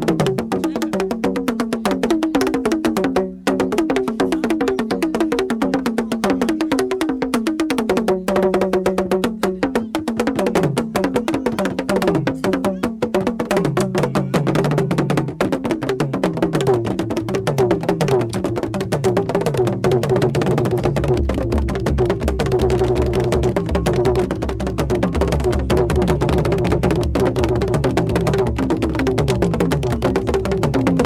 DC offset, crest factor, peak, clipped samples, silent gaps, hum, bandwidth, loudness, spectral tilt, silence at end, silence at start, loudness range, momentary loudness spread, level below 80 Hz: under 0.1%; 16 dB; -2 dBFS; under 0.1%; none; none; 16 kHz; -19 LUFS; -6.5 dB/octave; 0 s; 0 s; 1 LU; 4 LU; -30 dBFS